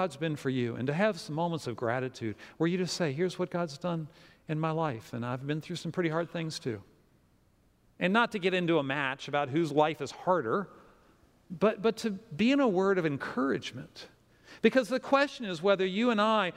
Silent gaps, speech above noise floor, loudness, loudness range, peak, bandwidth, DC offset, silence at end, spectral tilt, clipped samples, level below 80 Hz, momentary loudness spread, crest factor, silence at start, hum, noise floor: none; 36 dB; -30 LUFS; 5 LU; -10 dBFS; 15.5 kHz; under 0.1%; 0 s; -6 dB/octave; under 0.1%; -70 dBFS; 11 LU; 20 dB; 0 s; none; -66 dBFS